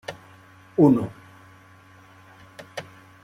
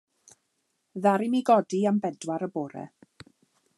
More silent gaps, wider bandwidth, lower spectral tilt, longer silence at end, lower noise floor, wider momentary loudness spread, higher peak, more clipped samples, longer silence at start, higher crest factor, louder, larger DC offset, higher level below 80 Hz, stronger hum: neither; about the same, 13 kHz vs 12 kHz; first, -8 dB/octave vs -6.5 dB/octave; second, 0.45 s vs 0.9 s; second, -51 dBFS vs -76 dBFS; first, 28 LU vs 19 LU; first, -4 dBFS vs -8 dBFS; neither; second, 0.1 s vs 0.95 s; about the same, 22 dB vs 20 dB; first, -21 LUFS vs -26 LUFS; neither; first, -62 dBFS vs -80 dBFS; neither